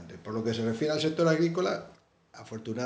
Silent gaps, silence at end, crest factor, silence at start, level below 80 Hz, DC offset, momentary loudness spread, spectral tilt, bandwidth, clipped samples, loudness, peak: none; 0 s; 18 dB; 0 s; -68 dBFS; under 0.1%; 12 LU; -6 dB/octave; 9.4 kHz; under 0.1%; -29 LUFS; -12 dBFS